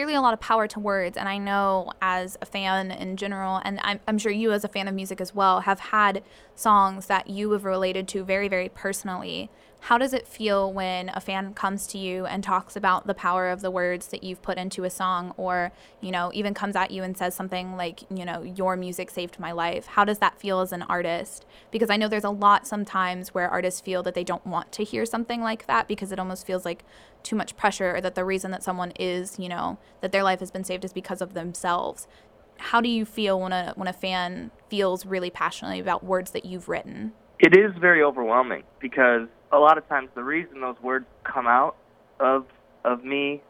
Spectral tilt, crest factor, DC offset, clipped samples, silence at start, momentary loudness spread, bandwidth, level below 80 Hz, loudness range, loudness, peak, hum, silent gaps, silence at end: -4.5 dB/octave; 22 dB; under 0.1%; under 0.1%; 0 s; 12 LU; 18 kHz; -58 dBFS; 7 LU; -25 LUFS; -2 dBFS; none; none; 0.1 s